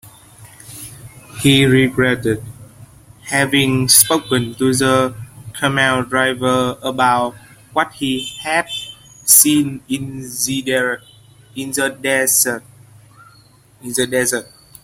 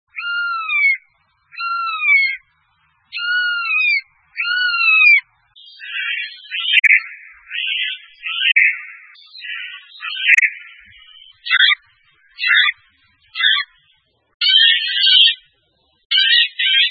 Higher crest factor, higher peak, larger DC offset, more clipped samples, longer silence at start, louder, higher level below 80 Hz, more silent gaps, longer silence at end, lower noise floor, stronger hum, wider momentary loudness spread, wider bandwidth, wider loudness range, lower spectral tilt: about the same, 18 dB vs 18 dB; about the same, 0 dBFS vs 0 dBFS; neither; neither; about the same, 0.05 s vs 0.15 s; about the same, -15 LUFS vs -14 LUFS; first, -50 dBFS vs -74 dBFS; second, none vs 14.34-14.40 s, 16.05-16.10 s; first, 0.4 s vs 0 s; second, -49 dBFS vs -62 dBFS; neither; first, 22 LU vs 18 LU; first, 16.5 kHz vs 11 kHz; about the same, 4 LU vs 4 LU; first, -3 dB/octave vs 5.5 dB/octave